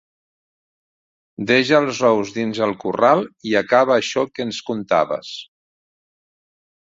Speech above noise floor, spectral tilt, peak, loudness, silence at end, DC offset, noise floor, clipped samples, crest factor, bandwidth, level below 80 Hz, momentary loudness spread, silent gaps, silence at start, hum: over 72 dB; -4.5 dB/octave; -2 dBFS; -18 LUFS; 1.5 s; under 0.1%; under -90 dBFS; under 0.1%; 20 dB; 7.8 kHz; -62 dBFS; 11 LU; none; 1.4 s; none